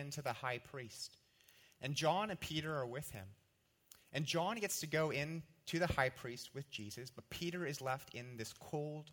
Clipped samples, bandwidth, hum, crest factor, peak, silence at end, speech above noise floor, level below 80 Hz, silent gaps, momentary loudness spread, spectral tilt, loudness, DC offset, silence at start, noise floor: under 0.1%; 18 kHz; none; 24 dB; -18 dBFS; 0 s; 35 dB; -68 dBFS; none; 13 LU; -4 dB/octave; -42 LUFS; under 0.1%; 0 s; -77 dBFS